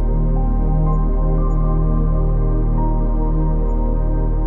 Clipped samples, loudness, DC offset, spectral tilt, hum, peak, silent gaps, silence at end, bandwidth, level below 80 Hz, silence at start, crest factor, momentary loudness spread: under 0.1%; -20 LUFS; under 0.1%; -12.5 dB/octave; none; -6 dBFS; none; 0 s; 2.2 kHz; -16 dBFS; 0 s; 10 dB; 2 LU